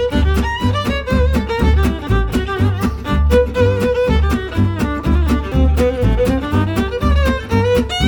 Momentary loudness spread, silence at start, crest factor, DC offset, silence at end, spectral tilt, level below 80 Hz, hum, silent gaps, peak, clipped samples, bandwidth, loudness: 4 LU; 0 s; 12 dB; under 0.1%; 0 s; -7 dB/octave; -18 dBFS; none; none; -2 dBFS; under 0.1%; 18.5 kHz; -16 LUFS